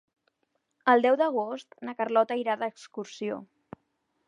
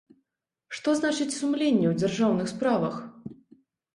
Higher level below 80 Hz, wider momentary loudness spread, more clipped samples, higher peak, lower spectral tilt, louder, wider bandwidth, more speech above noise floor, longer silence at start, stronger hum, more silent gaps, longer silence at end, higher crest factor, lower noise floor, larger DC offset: second, -80 dBFS vs -66 dBFS; about the same, 18 LU vs 17 LU; neither; about the same, -8 dBFS vs -10 dBFS; about the same, -5 dB/octave vs -5.5 dB/octave; about the same, -27 LUFS vs -26 LUFS; second, 10 kHz vs 11.5 kHz; second, 50 dB vs 58 dB; first, 0.85 s vs 0.7 s; neither; neither; first, 0.85 s vs 0.6 s; first, 22 dB vs 16 dB; second, -77 dBFS vs -83 dBFS; neither